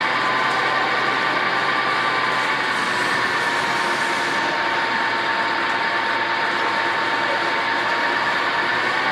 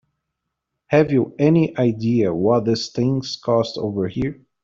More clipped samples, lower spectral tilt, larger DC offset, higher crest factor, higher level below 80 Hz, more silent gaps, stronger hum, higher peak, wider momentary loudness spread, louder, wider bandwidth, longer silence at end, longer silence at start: neither; second, -2.5 dB/octave vs -7 dB/octave; neither; about the same, 12 dB vs 16 dB; second, -64 dBFS vs -52 dBFS; neither; neither; second, -8 dBFS vs -4 dBFS; second, 1 LU vs 7 LU; about the same, -19 LUFS vs -20 LUFS; first, 15 kHz vs 7.6 kHz; second, 0 s vs 0.3 s; second, 0 s vs 0.9 s